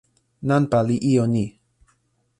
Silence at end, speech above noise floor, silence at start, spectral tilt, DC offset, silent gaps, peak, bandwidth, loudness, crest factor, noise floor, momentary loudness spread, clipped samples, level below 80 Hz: 0.9 s; 47 dB; 0.4 s; -8 dB/octave; under 0.1%; none; -6 dBFS; 11.5 kHz; -21 LUFS; 16 dB; -66 dBFS; 10 LU; under 0.1%; -54 dBFS